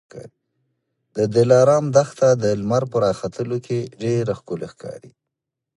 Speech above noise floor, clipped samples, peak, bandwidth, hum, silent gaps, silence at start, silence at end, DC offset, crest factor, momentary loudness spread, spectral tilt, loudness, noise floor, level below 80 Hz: 63 dB; under 0.1%; -2 dBFS; 11.5 kHz; none; none; 0.15 s; 0.7 s; under 0.1%; 20 dB; 16 LU; -6.5 dB/octave; -19 LUFS; -83 dBFS; -56 dBFS